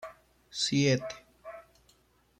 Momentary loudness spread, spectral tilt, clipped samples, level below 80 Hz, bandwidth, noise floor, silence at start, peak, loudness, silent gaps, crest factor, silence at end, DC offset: 22 LU; -4.5 dB/octave; under 0.1%; -66 dBFS; 12 kHz; -66 dBFS; 0 s; -14 dBFS; -29 LUFS; none; 18 dB; 0.8 s; under 0.1%